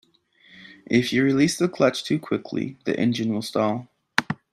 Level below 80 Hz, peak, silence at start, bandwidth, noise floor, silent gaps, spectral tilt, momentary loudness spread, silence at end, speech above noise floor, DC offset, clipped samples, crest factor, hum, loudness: -64 dBFS; -2 dBFS; 0.55 s; 13.5 kHz; -57 dBFS; none; -5 dB/octave; 8 LU; 0.2 s; 35 dB; under 0.1%; under 0.1%; 22 dB; none; -23 LUFS